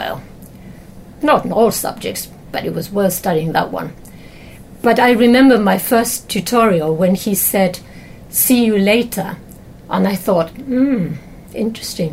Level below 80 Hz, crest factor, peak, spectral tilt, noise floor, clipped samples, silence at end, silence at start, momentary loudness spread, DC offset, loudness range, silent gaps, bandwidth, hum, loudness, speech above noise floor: -44 dBFS; 14 dB; -2 dBFS; -4.5 dB/octave; -37 dBFS; under 0.1%; 0 s; 0 s; 15 LU; under 0.1%; 6 LU; none; 16.5 kHz; none; -15 LUFS; 22 dB